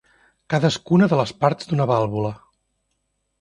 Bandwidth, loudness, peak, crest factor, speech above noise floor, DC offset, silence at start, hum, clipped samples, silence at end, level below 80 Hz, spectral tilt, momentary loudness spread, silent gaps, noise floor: 11 kHz; -20 LUFS; -2 dBFS; 20 dB; 54 dB; under 0.1%; 0.5 s; none; under 0.1%; 1.05 s; -56 dBFS; -7 dB/octave; 8 LU; none; -73 dBFS